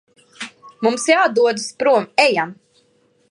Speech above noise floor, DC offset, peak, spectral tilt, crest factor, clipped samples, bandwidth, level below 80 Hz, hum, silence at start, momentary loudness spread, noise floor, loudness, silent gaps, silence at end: 43 dB; under 0.1%; 0 dBFS; -3 dB/octave; 18 dB; under 0.1%; 11.5 kHz; -74 dBFS; none; 0.4 s; 19 LU; -59 dBFS; -17 LUFS; none; 0.8 s